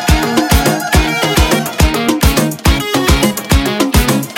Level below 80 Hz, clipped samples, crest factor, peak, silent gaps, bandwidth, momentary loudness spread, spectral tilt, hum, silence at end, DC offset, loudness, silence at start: -18 dBFS; under 0.1%; 12 dB; 0 dBFS; none; 17.5 kHz; 2 LU; -4.5 dB/octave; none; 0 s; under 0.1%; -12 LUFS; 0 s